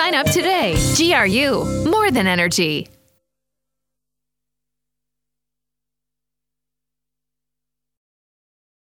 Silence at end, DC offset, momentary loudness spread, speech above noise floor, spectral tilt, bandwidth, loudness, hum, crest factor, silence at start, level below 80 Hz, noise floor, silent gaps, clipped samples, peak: 6.05 s; under 0.1%; 5 LU; 69 dB; -3.5 dB/octave; 18 kHz; -16 LUFS; 50 Hz at -55 dBFS; 20 dB; 0 s; -40 dBFS; -86 dBFS; none; under 0.1%; -2 dBFS